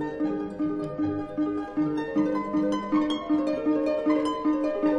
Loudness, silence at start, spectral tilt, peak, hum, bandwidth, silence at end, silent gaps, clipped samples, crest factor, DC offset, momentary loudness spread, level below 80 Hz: -27 LUFS; 0 s; -7 dB/octave; -14 dBFS; none; 7.8 kHz; 0 s; none; under 0.1%; 12 dB; under 0.1%; 4 LU; -56 dBFS